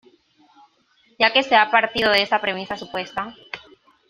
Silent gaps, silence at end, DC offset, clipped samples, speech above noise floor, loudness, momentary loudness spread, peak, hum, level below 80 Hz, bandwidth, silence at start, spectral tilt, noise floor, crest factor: none; 0.5 s; under 0.1%; under 0.1%; 41 dB; -19 LUFS; 18 LU; 0 dBFS; none; -60 dBFS; 15.5 kHz; 1.2 s; -3.5 dB/octave; -61 dBFS; 22 dB